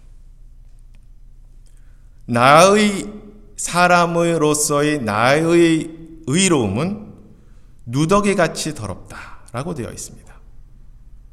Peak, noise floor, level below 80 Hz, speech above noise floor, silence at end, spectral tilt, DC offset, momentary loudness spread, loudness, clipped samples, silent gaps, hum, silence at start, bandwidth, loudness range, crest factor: 0 dBFS; -43 dBFS; -42 dBFS; 26 dB; 0.25 s; -4.5 dB/octave; under 0.1%; 20 LU; -16 LUFS; under 0.1%; none; none; 0.15 s; 14.5 kHz; 7 LU; 18 dB